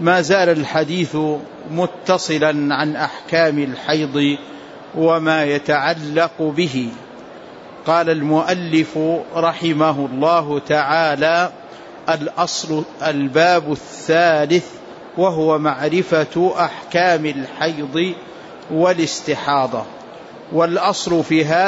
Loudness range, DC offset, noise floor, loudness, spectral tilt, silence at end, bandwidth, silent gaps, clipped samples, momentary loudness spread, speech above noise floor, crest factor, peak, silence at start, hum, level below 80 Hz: 2 LU; under 0.1%; -37 dBFS; -18 LUFS; -5 dB/octave; 0 s; 8 kHz; none; under 0.1%; 13 LU; 20 dB; 14 dB; -2 dBFS; 0 s; none; -60 dBFS